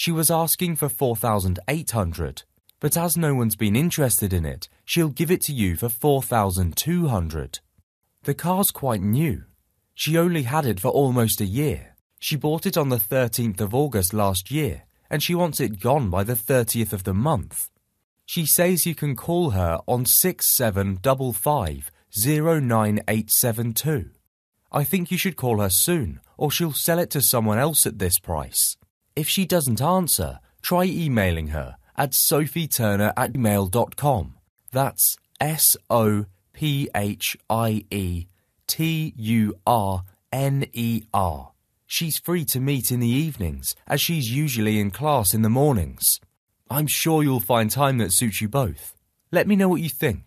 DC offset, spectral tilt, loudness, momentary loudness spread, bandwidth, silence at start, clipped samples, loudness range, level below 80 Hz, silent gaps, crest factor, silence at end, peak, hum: under 0.1%; -4.5 dB/octave; -22 LUFS; 10 LU; 14.5 kHz; 0 s; under 0.1%; 4 LU; -44 dBFS; 7.83-8.01 s, 12.01-12.10 s, 18.04-18.16 s, 24.27-24.53 s, 28.90-29.01 s, 34.49-34.56 s, 46.37-46.47 s; 20 dB; 0.05 s; -2 dBFS; none